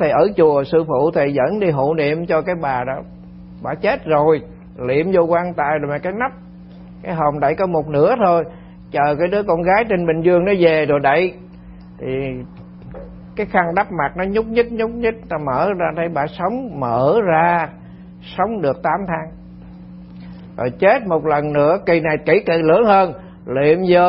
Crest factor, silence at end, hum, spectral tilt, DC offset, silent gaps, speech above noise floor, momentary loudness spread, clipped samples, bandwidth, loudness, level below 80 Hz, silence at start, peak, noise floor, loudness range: 16 dB; 0 s; 60 Hz at -40 dBFS; -12 dB/octave; under 0.1%; none; 22 dB; 17 LU; under 0.1%; 5.6 kHz; -17 LUFS; -44 dBFS; 0 s; 0 dBFS; -38 dBFS; 5 LU